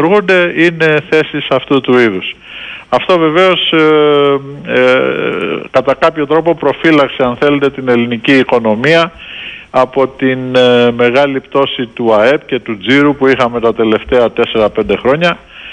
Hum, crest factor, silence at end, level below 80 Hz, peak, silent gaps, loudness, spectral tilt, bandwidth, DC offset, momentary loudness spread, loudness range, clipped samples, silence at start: none; 10 dB; 0 s; -44 dBFS; 0 dBFS; none; -10 LUFS; -6 dB/octave; 9.8 kHz; under 0.1%; 7 LU; 1 LU; under 0.1%; 0 s